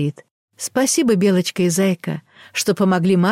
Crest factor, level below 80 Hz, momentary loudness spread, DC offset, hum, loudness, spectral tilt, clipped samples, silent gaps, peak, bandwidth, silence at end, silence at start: 12 dB; -62 dBFS; 12 LU; under 0.1%; none; -18 LUFS; -5 dB/octave; under 0.1%; 0.31-0.48 s; -6 dBFS; 16 kHz; 0 s; 0 s